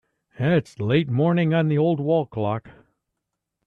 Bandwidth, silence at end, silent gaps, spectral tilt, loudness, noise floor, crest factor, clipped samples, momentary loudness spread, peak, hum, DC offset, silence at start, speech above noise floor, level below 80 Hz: 6.8 kHz; 0.95 s; none; -9 dB/octave; -22 LUFS; -81 dBFS; 16 dB; under 0.1%; 7 LU; -6 dBFS; none; under 0.1%; 0.4 s; 60 dB; -60 dBFS